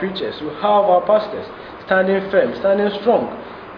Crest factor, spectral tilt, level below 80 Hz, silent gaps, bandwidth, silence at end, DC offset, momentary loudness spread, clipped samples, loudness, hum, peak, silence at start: 16 dB; -8 dB/octave; -54 dBFS; none; 5.4 kHz; 0 s; under 0.1%; 15 LU; under 0.1%; -17 LUFS; none; -2 dBFS; 0 s